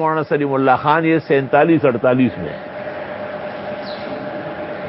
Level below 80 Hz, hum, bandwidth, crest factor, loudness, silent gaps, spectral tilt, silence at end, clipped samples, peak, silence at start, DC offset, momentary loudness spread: -54 dBFS; none; 5.8 kHz; 18 dB; -18 LUFS; none; -12 dB/octave; 0 s; under 0.1%; 0 dBFS; 0 s; under 0.1%; 13 LU